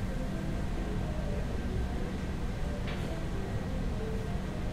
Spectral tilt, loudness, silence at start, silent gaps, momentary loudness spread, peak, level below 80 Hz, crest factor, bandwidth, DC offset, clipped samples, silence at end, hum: -7 dB/octave; -36 LUFS; 0 s; none; 1 LU; -22 dBFS; -36 dBFS; 12 dB; 15 kHz; under 0.1%; under 0.1%; 0 s; none